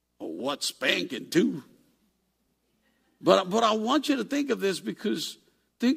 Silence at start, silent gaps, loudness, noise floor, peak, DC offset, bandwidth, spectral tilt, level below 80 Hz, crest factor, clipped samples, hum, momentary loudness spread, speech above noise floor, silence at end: 0.2 s; none; -27 LUFS; -74 dBFS; -4 dBFS; under 0.1%; 15.5 kHz; -4 dB/octave; -74 dBFS; 24 dB; under 0.1%; none; 9 LU; 47 dB; 0 s